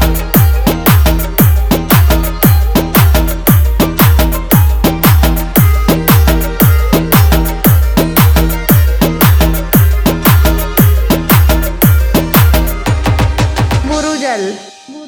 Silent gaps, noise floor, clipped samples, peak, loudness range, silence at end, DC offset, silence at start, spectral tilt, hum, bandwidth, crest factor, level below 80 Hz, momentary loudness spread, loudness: none; -30 dBFS; 0.5%; 0 dBFS; 1 LU; 0 s; under 0.1%; 0 s; -5.5 dB/octave; none; over 20 kHz; 8 dB; -14 dBFS; 4 LU; -10 LUFS